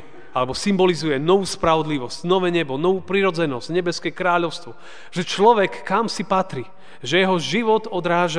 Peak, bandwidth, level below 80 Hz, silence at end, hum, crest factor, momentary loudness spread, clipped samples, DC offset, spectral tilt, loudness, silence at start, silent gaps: -2 dBFS; 10 kHz; -54 dBFS; 0 s; none; 18 dB; 10 LU; under 0.1%; 2%; -5 dB/octave; -20 LUFS; 0.15 s; none